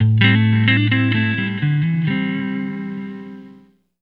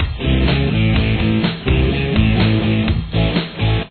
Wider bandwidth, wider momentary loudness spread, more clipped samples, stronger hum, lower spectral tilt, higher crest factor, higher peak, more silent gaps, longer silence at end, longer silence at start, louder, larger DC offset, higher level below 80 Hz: about the same, 4.9 kHz vs 4.5 kHz; first, 16 LU vs 4 LU; neither; neither; about the same, -9 dB/octave vs -10 dB/octave; about the same, 18 dB vs 14 dB; about the same, 0 dBFS vs 0 dBFS; neither; first, 0.5 s vs 0 s; about the same, 0 s vs 0 s; about the same, -18 LUFS vs -16 LUFS; neither; second, -54 dBFS vs -22 dBFS